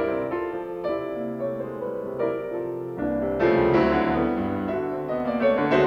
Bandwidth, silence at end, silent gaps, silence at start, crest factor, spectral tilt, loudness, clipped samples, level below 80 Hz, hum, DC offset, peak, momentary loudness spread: 6.6 kHz; 0 s; none; 0 s; 16 dB; -8.5 dB/octave; -25 LUFS; under 0.1%; -48 dBFS; none; under 0.1%; -8 dBFS; 10 LU